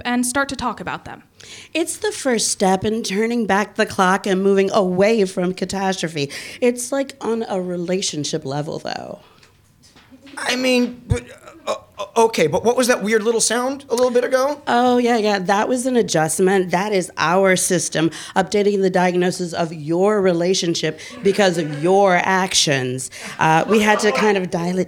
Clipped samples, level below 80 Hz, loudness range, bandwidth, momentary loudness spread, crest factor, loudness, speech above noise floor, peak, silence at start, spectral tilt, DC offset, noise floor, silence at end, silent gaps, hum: under 0.1%; -50 dBFS; 7 LU; 18 kHz; 10 LU; 16 dB; -18 LUFS; 34 dB; -2 dBFS; 0.05 s; -4 dB/octave; under 0.1%; -52 dBFS; 0 s; none; none